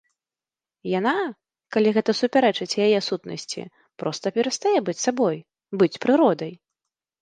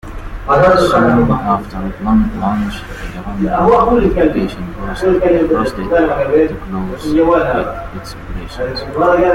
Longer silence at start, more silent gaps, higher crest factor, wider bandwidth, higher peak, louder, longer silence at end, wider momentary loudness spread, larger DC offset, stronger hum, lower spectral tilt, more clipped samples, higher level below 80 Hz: first, 0.85 s vs 0.05 s; neither; first, 18 dB vs 12 dB; second, 9.8 kHz vs 16 kHz; second, -6 dBFS vs 0 dBFS; second, -23 LUFS vs -14 LUFS; first, 0.65 s vs 0 s; about the same, 14 LU vs 16 LU; neither; neither; second, -4.5 dB/octave vs -7 dB/octave; neither; second, -72 dBFS vs -28 dBFS